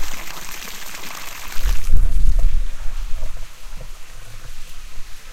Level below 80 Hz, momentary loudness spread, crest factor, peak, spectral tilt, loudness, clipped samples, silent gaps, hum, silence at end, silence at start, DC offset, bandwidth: -20 dBFS; 17 LU; 14 dB; 0 dBFS; -3.5 dB/octave; -27 LUFS; 0.2%; none; none; 0 s; 0 s; under 0.1%; 15 kHz